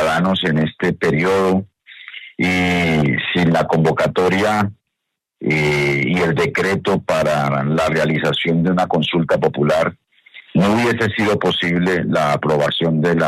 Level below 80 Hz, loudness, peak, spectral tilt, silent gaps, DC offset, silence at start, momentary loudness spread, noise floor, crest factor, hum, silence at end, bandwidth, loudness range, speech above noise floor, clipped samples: -50 dBFS; -17 LUFS; -2 dBFS; -6 dB/octave; none; under 0.1%; 0 s; 4 LU; -78 dBFS; 14 dB; none; 0 s; 14 kHz; 1 LU; 62 dB; under 0.1%